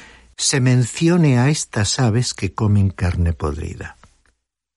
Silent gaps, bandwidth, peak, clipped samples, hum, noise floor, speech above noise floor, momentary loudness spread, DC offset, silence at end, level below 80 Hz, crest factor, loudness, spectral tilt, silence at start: none; 11.5 kHz; -4 dBFS; under 0.1%; none; -66 dBFS; 49 dB; 11 LU; under 0.1%; 0.85 s; -36 dBFS; 14 dB; -18 LUFS; -5 dB/octave; 0 s